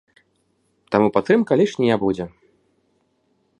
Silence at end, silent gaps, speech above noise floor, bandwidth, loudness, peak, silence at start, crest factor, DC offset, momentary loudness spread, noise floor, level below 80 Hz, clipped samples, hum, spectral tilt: 1.3 s; none; 48 dB; 10.5 kHz; -19 LUFS; 0 dBFS; 0.9 s; 22 dB; under 0.1%; 9 LU; -66 dBFS; -56 dBFS; under 0.1%; none; -7 dB/octave